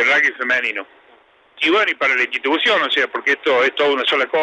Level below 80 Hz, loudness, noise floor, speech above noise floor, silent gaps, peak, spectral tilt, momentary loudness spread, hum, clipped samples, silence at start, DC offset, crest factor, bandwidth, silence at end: -76 dBFS; -16 LUFS; -52 dBFS; 34 dB; none; -4 dBFS; -2 dB/octave; 3 LU; none; under 0.1%; 0 s; under 0.1%; 14 dB; 10.5 kHz; 0 s